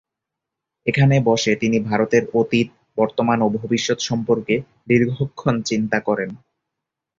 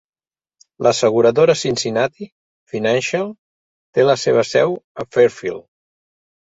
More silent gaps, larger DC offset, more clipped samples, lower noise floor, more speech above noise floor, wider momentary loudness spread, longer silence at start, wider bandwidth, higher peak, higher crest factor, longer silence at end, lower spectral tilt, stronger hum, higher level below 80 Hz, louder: second, none vs 2.32-2.67 s, 3.38-3.93 s, 4.84-4.95 s; neither; neither; second, -84 dBFS vs under -90 dBFS; second, 65 dB vs over 74 dB; second, 7 LU vs 14 LU; about the same, 0.85 s vs 0.8 s; about the same, 7.6 kHz vs 8 kHz; about the same, -2 dBFS vs -2 dBFS; about the same, 18 dB vs 18 dB; about the same, 0.85 s vs 0.95 s; first, -6 dB/octave vs -4.5 dB/octave; neither; about the same, -54 dBFS vs -58 dBFS; second, -20 LUFS vs -17 LUFS